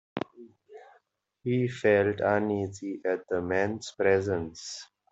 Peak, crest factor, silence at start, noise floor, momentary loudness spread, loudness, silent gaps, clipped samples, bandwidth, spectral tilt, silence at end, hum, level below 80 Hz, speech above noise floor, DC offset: -10 dBFS; 18 dB; 0.15 s; -68 dBFS; 14 LU; -28 LUFS; none; under 0.1%; 8.2 kHz; -6 dB/octave; 0.3 s; none; -68 dBFS; 40 dB; under 0.1%